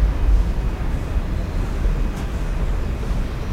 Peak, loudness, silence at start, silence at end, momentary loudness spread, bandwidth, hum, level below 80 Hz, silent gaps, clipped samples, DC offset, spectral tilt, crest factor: -6 dBFS; -24 LUFS; 0 s; 0 s; 5 LU; 10 kHz; none; -20 dBFS; none; under 0.1%; under 0.1%; -7 dB/octave; 14 dB